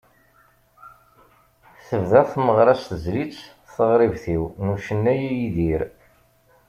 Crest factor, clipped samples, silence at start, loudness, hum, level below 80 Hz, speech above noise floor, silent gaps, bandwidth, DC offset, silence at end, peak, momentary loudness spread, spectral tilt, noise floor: 20 dB; under 0.1%; 0.85 s; -21 LUFS; none; -46 dBFS; 38 dB; none; 15 kHz; under 0.1%; 0.8 s; -2 dBFS; 11 LU; -8 dB/octave; -58 dBFS